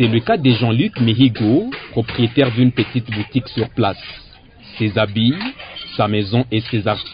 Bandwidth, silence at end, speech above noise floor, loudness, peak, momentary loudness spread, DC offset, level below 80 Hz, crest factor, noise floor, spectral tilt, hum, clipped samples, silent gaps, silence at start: 5.2 kHz; 0 s; 25 dB; -17 LUFS; -2 dBFS; 11 LU; under 0.1%; -46 dBFS; 16 dB; -41 dBFS; -12 dB/octave; none; under 0.1%; none; 0 s